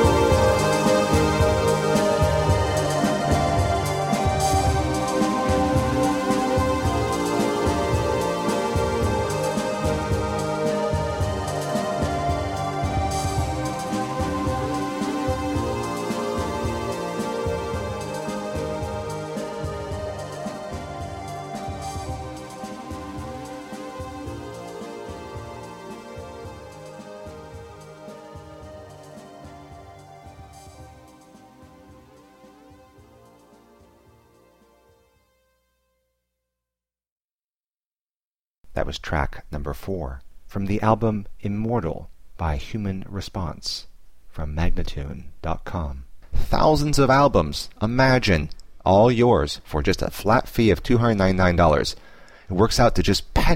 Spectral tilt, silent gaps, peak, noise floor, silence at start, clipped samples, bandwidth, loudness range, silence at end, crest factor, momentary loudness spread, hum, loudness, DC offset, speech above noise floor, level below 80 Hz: -5.5 dB/octave; 37.12-37.16 s, 37.24-37.28 s, 37.35-37.49 s, 37.86-37.90 s, 38.01-38.07 s, 38.16-38.20 s, 38.27-38.31 s, 38.47-38.54 s; -4 dBFS; under -90 dBFS; 0 s; under 0.1%; 16.5 kHz; 18 LU; 0 s; 18 dB; 20 LU; none; -23 LUFS; under 0.1%; over 69 dB; -34 dBFS